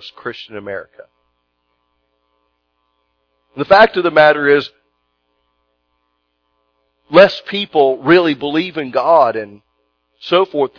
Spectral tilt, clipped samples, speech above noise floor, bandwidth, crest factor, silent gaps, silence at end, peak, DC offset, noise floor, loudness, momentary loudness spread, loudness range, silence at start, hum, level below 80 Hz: -6.5 dB/octave; 0.1%; 54 dB; 5.4 kHz; 16 dB; none; 0.1 s; 0 dBFS; under 0.1%; -68 dBFS; -13 LUFS; 18 LU; 6 LU; 0 s; 60 Hz at -60 dBFS; -56 dBFS